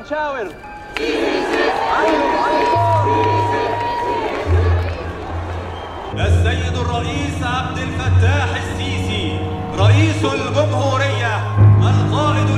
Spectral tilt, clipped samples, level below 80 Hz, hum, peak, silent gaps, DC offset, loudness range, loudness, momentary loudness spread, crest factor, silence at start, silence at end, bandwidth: -6.5 dB/octave; under 0.1%; -32 dBFS; none; -2 dBFS; none; under 0.1%; 4 LU; -17 LUFS; 12 LU; 14 dB; 0 s; 0 s; 10.5 kHz